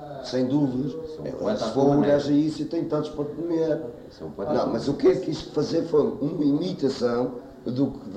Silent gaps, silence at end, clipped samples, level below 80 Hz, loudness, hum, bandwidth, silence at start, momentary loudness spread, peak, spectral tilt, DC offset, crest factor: none; 0 s; under 0.1%; -54 dBFS; -25 LUFS; none; 8.8 kHz; 0 s; 11 LU; -10 dBFS; -7.5 dB/octave; under 0.1%; 16 dB